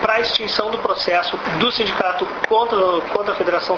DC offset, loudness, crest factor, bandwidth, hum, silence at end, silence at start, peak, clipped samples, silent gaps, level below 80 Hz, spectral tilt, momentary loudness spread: under 0.1%; -18 LUFS; 18 dB; 7.2 kHz; none; 0 s; 0 s; -2 dBFS; under 0.1%; none; -52 dBFS; -4.5 dB/octave; 4 LU